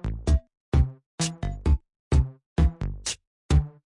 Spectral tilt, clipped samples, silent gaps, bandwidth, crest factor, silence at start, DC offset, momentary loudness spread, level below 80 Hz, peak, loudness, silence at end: -5.5 dB/octave; under 0.1%; 0.57-0.72 s, 1.06-1.18 s, 1.99-2.11 s, 2.46-2.56 s, 3.27-3.49 s; 11 kHz; 16 dB; 0.05 s; under 0.1%; 6 LU; -28 dBFS; -8 dBFS; -27 LUFS; 0.15 s